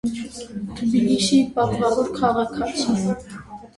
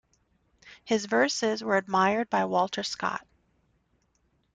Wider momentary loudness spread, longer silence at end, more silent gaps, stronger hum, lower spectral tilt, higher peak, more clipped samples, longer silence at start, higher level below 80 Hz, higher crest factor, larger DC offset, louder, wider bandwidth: first, 14 LU vs 7 LU; second, 0.1 s vs 1.35 s; neither; neither; first, -5 dB/octave vs -3.5 dB/octave; first, -6 dBFS vs -10 dBFS; neither; second, 0.05 s vs 0.65 s; first, -48 dBFS vs -70 dBFS; about the same, 16 dB vs 18 dB; neither; first, -21 LUFS vs -27 LUFS; first, 11.5 kHz vs 9.4 kHz